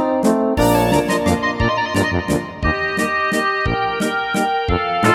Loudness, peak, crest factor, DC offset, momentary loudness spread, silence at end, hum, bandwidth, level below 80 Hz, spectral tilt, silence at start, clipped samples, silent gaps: -18 LUFS; 0 dBFS; 16 dB; under 0.1%; 4 LU; 0 s; none; 17.5 kHz; -32 dBFS; -5 dB/octave; 0 s; under 0.1%; none